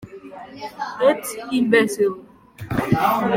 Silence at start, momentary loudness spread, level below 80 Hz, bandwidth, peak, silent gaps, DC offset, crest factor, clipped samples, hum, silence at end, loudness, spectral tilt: 0 s; 21 LU; -52 dBFS; 17 kHz; -4 dBFS; none; under 0.1%; 18 dB; under 0.1%; none; 0 s; -20 LUFS; -5.5 dB/octave